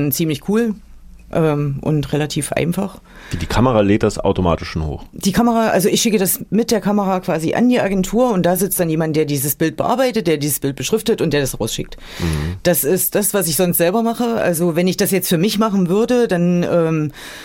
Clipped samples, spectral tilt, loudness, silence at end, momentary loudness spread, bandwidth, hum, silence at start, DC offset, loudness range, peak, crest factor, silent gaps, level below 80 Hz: under 0.1%; -5 dB/octave; -17 LUFS; 0 s; 7 LU; 17 kHz; none; 0 s; under 0.1%; 3 LU; -4 dBFS; 14 dB; none; -36 dBFS